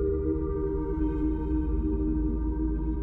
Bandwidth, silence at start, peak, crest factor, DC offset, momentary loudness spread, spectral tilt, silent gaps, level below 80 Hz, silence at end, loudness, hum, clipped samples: 2.6 kHz; 0 s; -16 dBFS; 10 dB; under 0.1%; 2 LU; -12.5 dB/octave; none; -30 dBFS; 0 s; -29 LUFS; none; under 0.1%